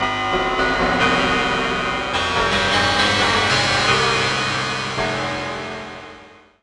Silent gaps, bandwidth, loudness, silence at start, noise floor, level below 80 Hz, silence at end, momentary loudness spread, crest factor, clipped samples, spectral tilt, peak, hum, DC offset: none; 11.5 kHz; -18 LUFS; 0 s; -44 dBFS; -40 dBFS; 0.35 s; 10 LU; 16 dB; under 0.1%; -3 dB/octave; -4 dBFS; none; under 0.1%